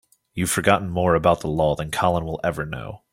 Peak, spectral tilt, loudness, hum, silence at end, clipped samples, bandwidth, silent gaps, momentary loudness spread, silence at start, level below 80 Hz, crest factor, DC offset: -2 dBFS; -5 dB/octave; -22 LUFS; none; 0.15 s; under 0.1%; 16.5 kHz; none; 11 LU; 0.35 s; -44 dBFS; 20 dB; under 0.1%